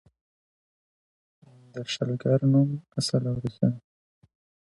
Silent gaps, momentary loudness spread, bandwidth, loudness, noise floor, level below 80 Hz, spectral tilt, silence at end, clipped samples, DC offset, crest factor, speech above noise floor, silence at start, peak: none; 15 LU; 11.5 kHz; -26 LUFS; under -90 dBFS; -62 dBFS; -6.5 dB/octave; 0.85 s; under 0.1%; under 0.1%; 18 dB; over 65 dB; 1.75 s; -10 dBFS